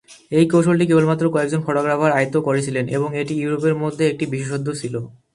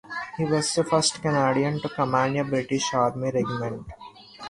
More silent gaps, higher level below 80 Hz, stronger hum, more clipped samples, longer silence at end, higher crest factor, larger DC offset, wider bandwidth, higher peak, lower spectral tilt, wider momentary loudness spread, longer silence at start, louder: neither; about the same, -58 dBFS vs -56 dBFS; neither; neither; first, 0.25 s vs 0 s; about the same, 18 dB vs 18 dB; neither; about the same, 11.5 kHz vs 11.5 kHz; first, -2 dBFS vs -6 dBFS; first, -6.5 dB/octave vs -4.5 dB/octave; second, 9 LU vs 12 LU; about the same, 0.1 s vs 0.05 s; first, -19 LUFS vs -24 LUFS